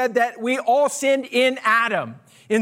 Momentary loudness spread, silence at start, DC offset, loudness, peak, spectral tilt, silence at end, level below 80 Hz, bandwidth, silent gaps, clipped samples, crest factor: 6 LU; 0 s; under 0.1%; -20 LUFS; -6 dBFS; -3 dB/octave; 0 s; -80 dBFS; 16 kHz; none; under 0.1%; 14 dB